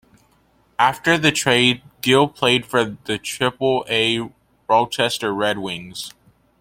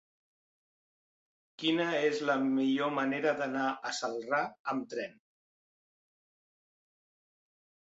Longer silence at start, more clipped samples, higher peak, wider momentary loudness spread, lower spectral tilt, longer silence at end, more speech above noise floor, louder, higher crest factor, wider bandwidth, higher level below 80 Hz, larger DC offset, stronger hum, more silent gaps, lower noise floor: second, 0.8 s vs 1.6 s; neither; first, 0 dBFS vs -16 dBFS; first, 14 LU vs 7 LU; about the same, -3.5 dB/octave vs -4.5 dB/octave; second, 0.5 s vs 2.8 s; second, 40 dB vs over 58 dB; first, -19 LUFS vs -32 LUFS; about the same, 20 dB vs 18 dB; first, 16.5 kHz vs 8 kHz; first, -56 dBFS vs -82 dBFS; neither; neither; second, none vs 4.60-4.65 s; second, -59 dBFS vs under -90 dBFS